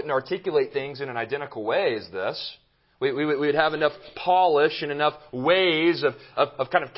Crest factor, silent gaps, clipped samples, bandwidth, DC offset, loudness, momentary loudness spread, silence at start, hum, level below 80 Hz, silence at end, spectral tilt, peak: 20 dB; none; under 0.1%; 5.8 kHz; under 0.1%; -24 LUFS; 10 LU; 0 s; none; -66 dBFS; 0.05 s; -9 dB/octave; -4 dBFS